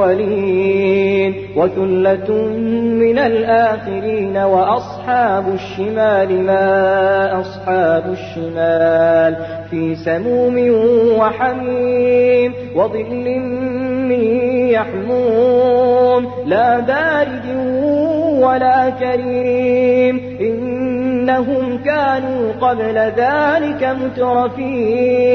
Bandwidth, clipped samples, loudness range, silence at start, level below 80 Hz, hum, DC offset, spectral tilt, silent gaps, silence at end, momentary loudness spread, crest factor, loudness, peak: 6.2 kHz; under 0.1%; 2 LU; 0 s; -50 dBFS; 50 Hz at -35 dBFS; under 0.1%; -8 dB/octave; none; 0 s; 7 LU; 12 dB; -15 LUFS; -2 dBFS